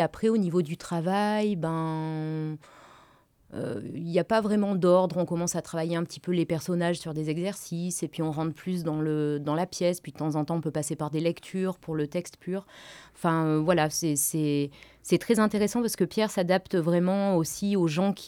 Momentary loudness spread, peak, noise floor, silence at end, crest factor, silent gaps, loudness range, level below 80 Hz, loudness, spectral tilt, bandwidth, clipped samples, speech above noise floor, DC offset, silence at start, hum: 10 LU; -10 dBFS; -60 dBFS; 0 s; 18 dB; none; 5 LU; -64 dBFS; -28 LUFS; -5.5 dB/octave; 18.5 kHz; under 0.1%; 33 dB; under 0.1%; 0 s; none